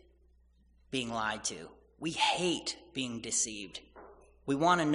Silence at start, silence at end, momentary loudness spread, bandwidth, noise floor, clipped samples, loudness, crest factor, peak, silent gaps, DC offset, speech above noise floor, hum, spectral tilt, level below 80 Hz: 0.9 s; 0 s; 17 LU; 10.5 kHz; -65 dBFS; under 0.1%; -33 LUFS; 22 dB; -14 dBFS; none; under 0.1%; 32 dB; none; -3 dB/octave; -64 dBFS